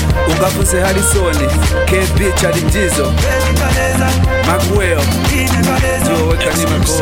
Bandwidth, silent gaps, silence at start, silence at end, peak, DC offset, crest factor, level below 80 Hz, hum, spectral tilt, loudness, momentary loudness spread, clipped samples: 17 kHz; none; 0 s; 0 s; -2 dBFS; 0.4%; 10 dB; -18 dBFS; none; -4.5 dB/octave; -13 LUFS; 1 LU; under 0.1%